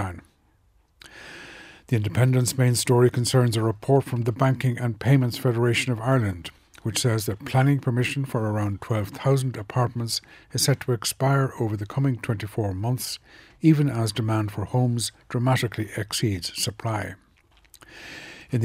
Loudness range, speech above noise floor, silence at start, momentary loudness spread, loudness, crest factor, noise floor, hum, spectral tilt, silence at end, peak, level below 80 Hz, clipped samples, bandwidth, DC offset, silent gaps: 4 LU; 39 dB; 0 s; 14 LU; -24 LUFS; 18 dB; -62 dBFS; none; -5.5 dB/octave; 0 s; -6 dBFS; -56 dBFS; under 0.1%; 16 kHz; under 0.1%; none